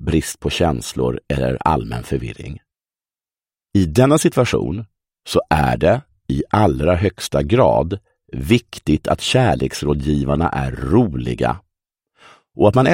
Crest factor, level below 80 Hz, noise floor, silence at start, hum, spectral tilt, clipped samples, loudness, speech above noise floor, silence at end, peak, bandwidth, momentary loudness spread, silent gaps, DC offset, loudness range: 18 dB; -34 dBFS; under -90 dBFS; 0 s; none; -6 dB/octave; under 0.1%; -18 LUFS; over 73 dB; 0 s; 0 dBFS; 16.5 kHz; 11 LU; none; under 0.1%; 4 LU